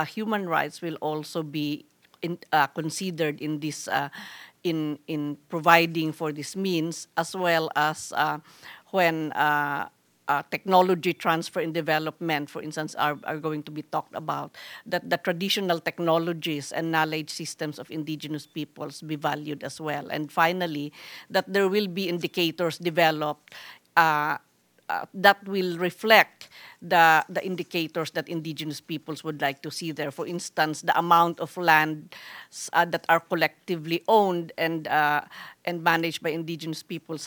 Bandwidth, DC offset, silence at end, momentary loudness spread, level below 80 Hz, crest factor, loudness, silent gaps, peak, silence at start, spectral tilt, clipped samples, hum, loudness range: 19.5 kHz; under 0.1%; 0 s; 14 LU; -80 dBFS; 24 dB; -26 LUFS; none; -2 dBFS; 0 s; -4.5 dB/octave; under 0.1%; none; 6 LU